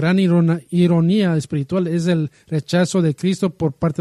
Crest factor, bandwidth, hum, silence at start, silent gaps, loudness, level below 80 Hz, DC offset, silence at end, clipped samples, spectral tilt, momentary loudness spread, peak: 14 dB; 11.5 kHz; none; 0 s; none; -18 LUFS; -54 dBFS; under 0.1%; 0.1 s; under 0.1%; -7 dB/octave; 6 LU; -4 dBFS